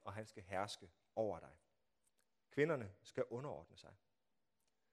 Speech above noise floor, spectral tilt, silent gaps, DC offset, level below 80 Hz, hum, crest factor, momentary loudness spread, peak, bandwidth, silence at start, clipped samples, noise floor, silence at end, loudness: over 45 dB; -5.5 dB/octave; none; under 0.1%; -80 dBFS; none; 24 dB; 22 LU; -22 dBFS; 13 kHz; 0.05 s; under 0.1%; under -90 dBFS; 1 s; -45 LUFS